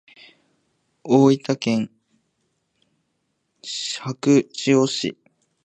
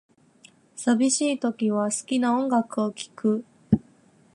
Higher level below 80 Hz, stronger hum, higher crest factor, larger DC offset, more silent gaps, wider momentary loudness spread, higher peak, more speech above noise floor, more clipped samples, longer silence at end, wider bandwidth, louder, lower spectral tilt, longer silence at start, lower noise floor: second, -70 dBFS vs -56 dBFS; neither; about the same, 20 dB vs 20 dB; neither; neither; first, 15 LU vs 7 LU; first, -2 dBFS vs -6 dBFS; first, 53 dB vs 34 dB; neither; about the same, 0.5 s vs 0.55 s; second, 9.4 kHz vs 11.5 kHz; first, -20 LUFS vs -25 LUFS; about the same, -5.5 dB/octave vs -4.5 dB/octave; first, 1.05 s vs 0.75 s; first, -73 dBFS vs -57 dBFS